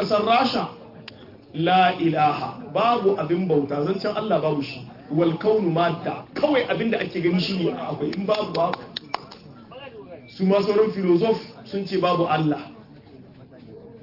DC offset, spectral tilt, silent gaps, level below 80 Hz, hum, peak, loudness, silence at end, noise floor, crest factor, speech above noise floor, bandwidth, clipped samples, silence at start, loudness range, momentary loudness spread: under 0.1%; -7.5 dB/octave; none; -62 dBFS; none; -6 dBFS; -23 LUFS; 0.05 s; -46 dBFS; 16 dB; 24 dB; 5.8 kHz; under 0.1%; 0 s; 3 LU; 19 LU